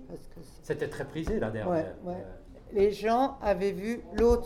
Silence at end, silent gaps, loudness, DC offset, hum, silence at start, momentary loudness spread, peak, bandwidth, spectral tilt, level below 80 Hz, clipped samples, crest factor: 0 s; none; -30 LUFS; under 0.1%; none; 0 s; 20 LU; -12 dBFS; 14 kHz; -6.5 dB/octave; -44 dBFS; under 0.1%; 18 dB